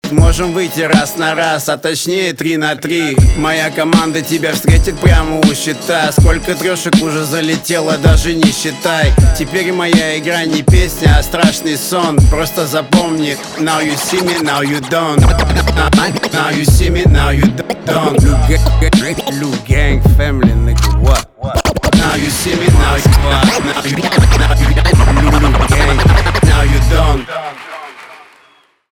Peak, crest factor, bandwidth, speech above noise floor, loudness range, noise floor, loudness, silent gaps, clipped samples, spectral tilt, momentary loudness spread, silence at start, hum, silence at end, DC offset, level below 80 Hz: 0 dBFS; 10 dB; 18.5 kHz; 39 dB; 3 LU; -49 dBFS; -12 LUFS; none; under 0.1%; -5 dB/octave; 5 LU; 0.05 s; none; 0.75 s; under 0.1%; -16 dBFS